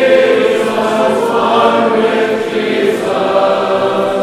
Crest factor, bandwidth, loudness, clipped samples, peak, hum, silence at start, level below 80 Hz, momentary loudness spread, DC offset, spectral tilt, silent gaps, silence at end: 12 dB; 14.5 kHz; -12 LUFS; under 0.1%; 0 dBFS; none; 0 s; -58 dBFS; 4 LU; 0.1%; -5 dB/octave; none; 0 s